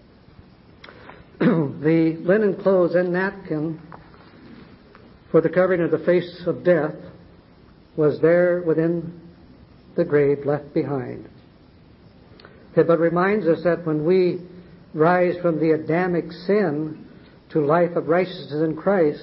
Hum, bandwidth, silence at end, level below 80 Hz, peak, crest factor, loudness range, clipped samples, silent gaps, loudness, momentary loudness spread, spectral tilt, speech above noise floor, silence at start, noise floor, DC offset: none; 5.8 kHz; 0 s; -58 dBFS; -6 dBFS; 16 dB; 3 LU; under 0.1%; none; -21 LUFS; 11 LU; -12 dB/octave; 30 dB; 1.05 s; -50 dBFS; under 0.1%